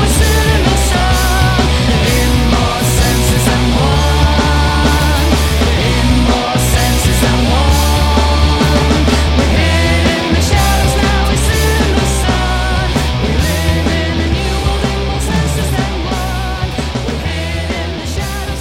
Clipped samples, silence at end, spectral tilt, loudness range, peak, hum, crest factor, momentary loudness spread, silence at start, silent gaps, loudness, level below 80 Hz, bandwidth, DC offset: under 0.1%; 0 s; -4.5 dB/octave; 5 LU; 0 dBFS; none; 12 dB; 7 LU; 0 s; none; -13 LUFS; -16 dBFS; 17 kHz; under 0.1%